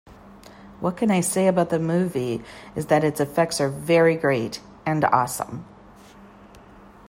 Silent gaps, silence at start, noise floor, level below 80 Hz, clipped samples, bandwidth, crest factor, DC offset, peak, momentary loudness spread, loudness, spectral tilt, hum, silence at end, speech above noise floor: none; 0.1 s; -47 dBFS; -56 dBFS; under 0.1%; 16 kHz; 20 dB; under 0.1%; -4 dBFS; 13 LU; -22 LUFS; -5.5 dB/octave; none; 0.5 s; 25 dB